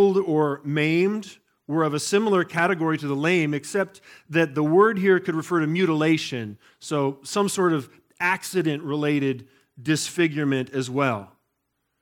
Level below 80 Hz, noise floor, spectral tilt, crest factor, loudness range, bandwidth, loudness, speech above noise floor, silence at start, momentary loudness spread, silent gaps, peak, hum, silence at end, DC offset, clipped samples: -74 dBFS; -76 dBFS; -5.5 dB/octave; 16 dB; 3 LU; 17.5 kHz; -23 LUFS; 53 dB; 0 s; 9 LU; none; -6 dBFS; none; 0.75 s; under 0.1%; under 0.1%